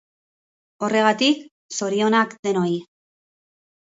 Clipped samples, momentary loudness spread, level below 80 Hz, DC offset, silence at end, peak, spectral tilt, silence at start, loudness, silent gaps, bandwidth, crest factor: under 0.1%; 11 LU; -72 dBFS; under 0.1%; 1.05 s; -4 dBFS; -4 dB/octave; 0.8 s; -21 LUFS; 1.51-1.69 s, 2.39-2.43 s; 8 kHz; 18 dB